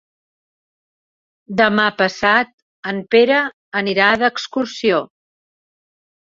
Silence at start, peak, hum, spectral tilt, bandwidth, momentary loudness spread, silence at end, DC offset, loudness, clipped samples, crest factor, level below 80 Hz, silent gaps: 1.5 s; -2 dBFS; none; -4.5 dB/octave; 7.6 kHz; 12 LU; 1.25 s; under 0.1%; -16 LUFS; under 0.1%; 18 dB; -60 dBFS; 2.53-2.83 s, 3.53-3.72 s